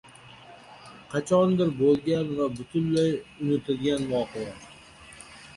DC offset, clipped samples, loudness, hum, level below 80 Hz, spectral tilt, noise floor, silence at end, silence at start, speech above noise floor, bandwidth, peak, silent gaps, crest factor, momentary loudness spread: under 0.1%; under 0.1%; -26 LUFS; none; -58 dBFS; -7 dB/octave; -49 dBFS; 0.05 s; 0.25 s; 24 dB; 11.5 kHz; -10 dBFS; none; 16 dB; 23 LU